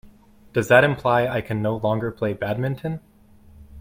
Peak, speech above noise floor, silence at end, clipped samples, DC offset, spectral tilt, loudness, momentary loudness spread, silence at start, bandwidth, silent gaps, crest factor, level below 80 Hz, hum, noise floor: 0 dBFS; 29 dB; 0 s; under 0.1%; under 0.1%; -6.5 dB/octave; -22 LUFS; 12 LU; 0.05 s; 16.5 kHz; none; 22 dB; -52 dBFS; none; -50 dBFS